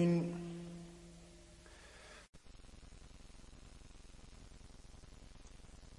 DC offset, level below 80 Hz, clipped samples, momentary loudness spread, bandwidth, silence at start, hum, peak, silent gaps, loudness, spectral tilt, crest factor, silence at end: under 0.1%; -60 dBFS; under 0.1%; 14 LU; 11.5 kHz; 0 s; none; -24 dBFS; 2.29-2.33 s; -44 LUFS; -7 dB/octave; 20 dB; 0 s